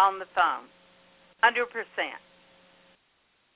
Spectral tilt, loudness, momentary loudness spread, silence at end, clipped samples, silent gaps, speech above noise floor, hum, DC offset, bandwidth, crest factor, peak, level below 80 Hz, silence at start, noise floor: 2 dB/octave; -27 LUFS; 12 LU; 1.4 s; under 0.1%; none; 43 dB; none; under 0.1%; 4 kHz; 22 dB; -8 dBFS; -74 dBFS; 0 s; -69 dBFS